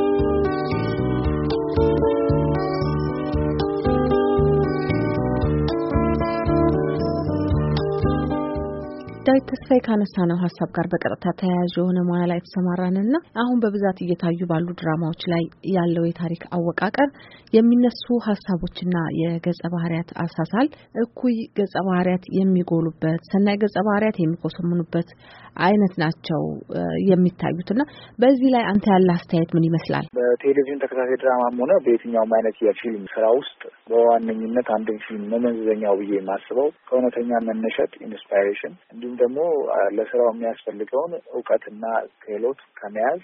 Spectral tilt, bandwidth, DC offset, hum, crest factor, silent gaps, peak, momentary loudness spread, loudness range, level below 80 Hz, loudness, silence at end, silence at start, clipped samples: -7 dB/octave; 5.8 kHz; under 0.1%; none; 16 dB; none; -4 dBFS; 8 LU; 4 LU; -40 dBFS; -22 LUFS; 0.05 s; 0 s; under 0.1%